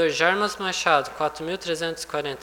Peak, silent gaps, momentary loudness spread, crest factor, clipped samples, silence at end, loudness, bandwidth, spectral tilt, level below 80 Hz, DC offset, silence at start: -4 dBFS; none; 8 LU; 20 dB; under 0.1%; 0 s; -24 LUFS; 19.5 kHz; -3 dB/octave; -58 dBFS; under 0.1%; 0 s